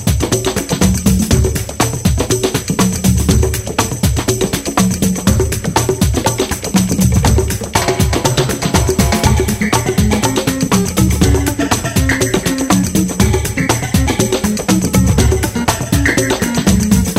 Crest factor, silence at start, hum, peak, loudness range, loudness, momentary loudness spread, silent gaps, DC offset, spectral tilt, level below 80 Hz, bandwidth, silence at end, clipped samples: 14 dB; 0 s; none; 0 dBFS; 1 LU; -14 LUFS; 3 LU; none; under 0.1%; -4.5 dB/octave; -22 dBFS; 16.5 kHz; 0 s; under 0.1%